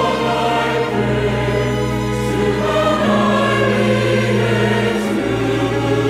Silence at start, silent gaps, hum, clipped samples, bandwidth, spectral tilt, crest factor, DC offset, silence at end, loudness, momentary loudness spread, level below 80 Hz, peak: 0 s; none; none; under 0.1%; 15 kHz; -6 dB/octave; 12 dB; under 0.1%; 0 s; -16 LUFS; 4 LU; -34 dBFS; -4 dBFS